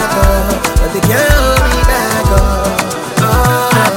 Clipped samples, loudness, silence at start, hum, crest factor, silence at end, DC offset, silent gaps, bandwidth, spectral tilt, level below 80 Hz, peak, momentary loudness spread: under 0.1%; -11 LUFS; 0 s; none; 10 dB; 0 s; under 0.1%; none; 17 kHz; -4.5 dB/octave; -14 dBFS; 0 dBFS; 4 LU